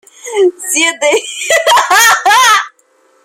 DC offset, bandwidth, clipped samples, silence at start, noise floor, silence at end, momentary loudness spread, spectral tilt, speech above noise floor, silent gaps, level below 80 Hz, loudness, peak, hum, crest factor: under 0.1%; 17 kHz; under 0.1%; 0.25 s; -52 dBFS; 0.55 s; 7 LU; 1 dB/octave; 42 dB; none; -64 dBFS; -9 LUFS; 0 dBFS; none; 10 dB